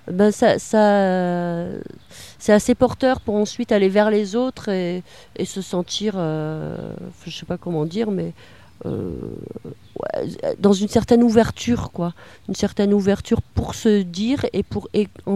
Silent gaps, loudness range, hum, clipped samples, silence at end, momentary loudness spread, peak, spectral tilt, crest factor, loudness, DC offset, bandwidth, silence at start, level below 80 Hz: none; 8 LU; none; under 0.1%; 0 s; 17 LU; 0 dBFS; -6 dB/octave; 20 dB; -20 LUFS; 0.3%; 13.5 kHz; 0.05 s; -44 dBFS